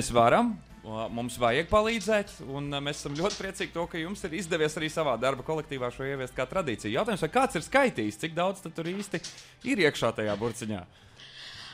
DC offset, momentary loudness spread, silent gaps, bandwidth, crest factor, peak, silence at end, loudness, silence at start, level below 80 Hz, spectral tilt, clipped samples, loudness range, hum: under 0.1%; 12 LU; none; 16 kHz; 20 dB; -8 dBFS; 0 s; -29 LUFS; 0 s; -52 dBFS; -4.5 dB/octave; under 0.1%; 3 LU; none